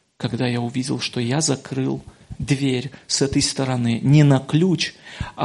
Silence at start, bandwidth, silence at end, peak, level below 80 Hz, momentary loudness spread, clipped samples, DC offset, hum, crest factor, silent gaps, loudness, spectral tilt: 0.2 s; 11.5 kHz; 0 s; -2 dBFS; -46 dBFS; 11 LU; under 0.1%; under 0.1%; none; 18 dB; none; -20 LUFS; -5 dB/octave